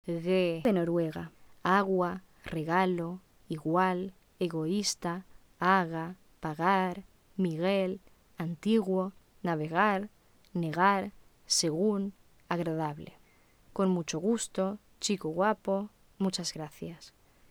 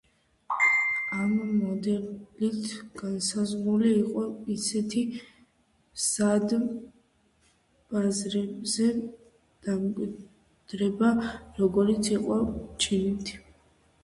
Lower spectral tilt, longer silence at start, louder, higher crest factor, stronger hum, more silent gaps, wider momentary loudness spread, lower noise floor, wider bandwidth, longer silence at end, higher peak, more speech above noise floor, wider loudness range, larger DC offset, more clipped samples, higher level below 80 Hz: about the same, -5 dB/octave vs -4.5 dB/octave; second, 0.05 s vs 0.5 s; second, -31 LUFS vs -28 LUFS; about the same, 20 dB vs 16 dB; neither; neither; about the same, 15 LU vs 13 LU; second, -62 dBFS vs -67 dBFS; first, 17.5 kHz vs 11.5 kHz; second, 0.4 s vs 0.65 s; about the same, -12 dBFS vs -12 dBFS; second, 32 dB vs 40 dB; about the same, 2 LU vs 3 LU; neither; neither; second, -64 dBFS vs -56 dBFS